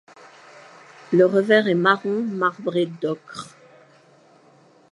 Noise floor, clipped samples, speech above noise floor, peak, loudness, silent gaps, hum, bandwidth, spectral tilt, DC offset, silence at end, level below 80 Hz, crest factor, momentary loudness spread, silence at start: -54 dBFS; under 0.1%; 34 dB; -4 dBFS; -20 LUFS; none; none; 11.5 kHz; -6.5 dB/octave; under 0.1%; 1.45 s; -76 dBFS; 20 dB; 17 LU; 1.1 s